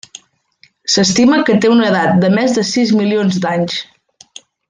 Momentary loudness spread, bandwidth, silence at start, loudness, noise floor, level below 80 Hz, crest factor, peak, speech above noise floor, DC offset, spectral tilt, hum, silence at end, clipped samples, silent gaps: 7 LU; 9.6 kHz; 0.85 s; -13 LUFS; -52 dBFS; -54 dBFS; 12 dB; -2 dBFS; 40 dB; under 0.1%; -4.5 dB/octave; none; 0.85 s; under 0.1%; none